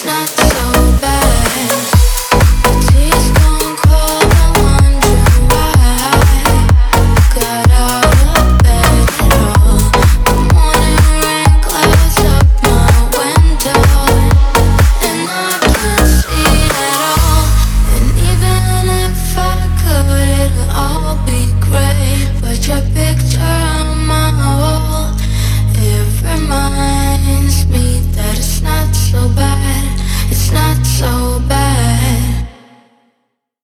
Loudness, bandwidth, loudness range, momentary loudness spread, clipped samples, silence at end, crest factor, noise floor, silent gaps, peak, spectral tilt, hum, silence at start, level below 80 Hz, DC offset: -11 LUFS; over 20 kHz; 4 LU; 5 LU; under 0.1%; 1.15 s; 10 dB; -66 dBFS; none; 0 dBFS; -4.5 dB/octave; none; 0 s; -12 dBFS; under 0.1%